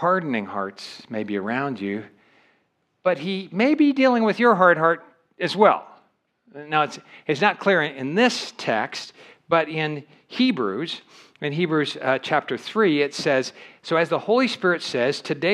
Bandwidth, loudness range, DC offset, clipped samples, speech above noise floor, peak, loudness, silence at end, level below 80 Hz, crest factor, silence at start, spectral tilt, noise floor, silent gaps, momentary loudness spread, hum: 12 kHz; 6 LU; under 0.1%; under 0.1%; 47 dB; -2 dBFS; -22 LUFS; 0 s; -80 dBFS; 22 dB; 0 s; -5 dB/octave; -69 dBFS; none; 13 LU; none